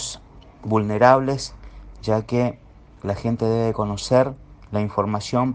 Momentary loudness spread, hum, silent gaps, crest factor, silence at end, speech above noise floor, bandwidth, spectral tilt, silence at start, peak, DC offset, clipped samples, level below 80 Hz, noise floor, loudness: 17 LU; none; none; 22 dB; 0 s; 24 dB; 9.8 kHz; -6 dB/octave; 0 s; 0 dBFS; under 0.1%; under 0.1%; -46 dBFS; -44 dBFS; -22 LUFS